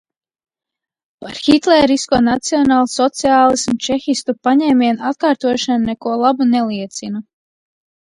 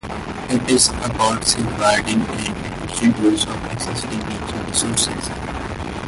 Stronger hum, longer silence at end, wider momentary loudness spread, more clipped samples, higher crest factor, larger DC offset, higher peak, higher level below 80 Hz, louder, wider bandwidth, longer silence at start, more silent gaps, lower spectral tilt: neither; first, 0.9 s vs 0 s; about the same, 12 LU vs 11 LU; neither; about the same, 16 dB vs 20 dB; neither; about the same, 0 dBFS vs 0 dBFS; second, -50 dBFS vs -36 dBFS; first, -15 LUFS vs -19 LUFS; about the same, 11 kHz vs 12 kHz; first, 1.2 s vs 0.05 s; neither; about the same, -4 dB/octave vs -3.5 dB/octave